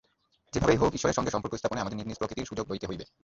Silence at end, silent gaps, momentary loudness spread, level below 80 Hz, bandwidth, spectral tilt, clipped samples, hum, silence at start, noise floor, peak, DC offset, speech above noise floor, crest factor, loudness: 0.2 s; none; 11 LU; -48 dBFS; 7.8 kHz; -5 dB/octave; under 0.1%; none; 0.55 s; -71 dBFS; -10 dBFS; under 0.1%; 42 dB; 22 dB; -30 LUFS